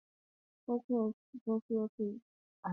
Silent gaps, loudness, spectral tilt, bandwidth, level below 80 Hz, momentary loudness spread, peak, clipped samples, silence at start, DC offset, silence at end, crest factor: 0.84-0.89 s, 1.13-1.33 s, 1.41-1.46 s, 1.62-1.69 s, 1.89-1.98 s, 2.22-2.63 s; -38 LUFS; -10.5 dB/octave; 2 kHz; -84 dBFS; 11 LU; -24 dBFS; under 0.1%; 0.7 s; under 0.1%; 0 s; 16 dB